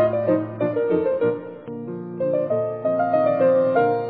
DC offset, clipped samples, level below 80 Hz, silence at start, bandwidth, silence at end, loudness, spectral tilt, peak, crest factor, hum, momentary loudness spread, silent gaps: under 0.1%; under 0.1%; -64 dBFS; 0 s; 4.6 kHz; 0 s; -21 LUFS; -11.5 dB/octave; -8 dBFS; 14 dB; none; 14 LU; none